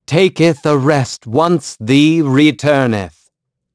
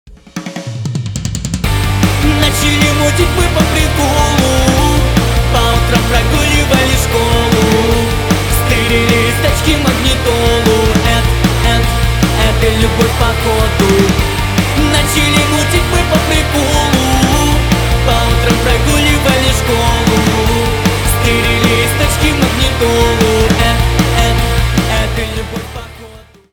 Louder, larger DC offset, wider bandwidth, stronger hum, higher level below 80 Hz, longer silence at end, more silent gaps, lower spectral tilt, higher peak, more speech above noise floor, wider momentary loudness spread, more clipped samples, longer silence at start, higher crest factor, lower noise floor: about the same, -13 LUFS vs -11 LUFS; neither; second, 11 kHz vs over 20 kHz; neither; second, -54 dBFS vs -18 dBFS; first, 0.65 s vs 0.3 s; neither; first, -6 dB/octave vs -4.5 dB/octave; about the same, 0 dBFS vs 0 dBFS; first, 51 dB vs 25 dB; first, 7 LU vs 4 LU; neither; about the same, 0.1 s vs 0.05 s; about the same, 14 dB vs 10 dB; first, -64 dBFS vs -35 dBFS